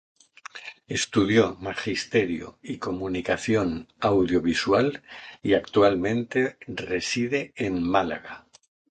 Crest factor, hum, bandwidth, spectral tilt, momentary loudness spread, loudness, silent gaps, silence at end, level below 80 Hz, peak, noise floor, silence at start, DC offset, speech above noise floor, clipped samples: 20 dB; none; 9.4 kHz; -5 dB/octave; 18 LU; -25 LUFS; none; 0.5 s; -52 dBFS; -6 dBFS; -45 dBFS; 0.55 s; under 0.1%; 20 dB; under 0.1%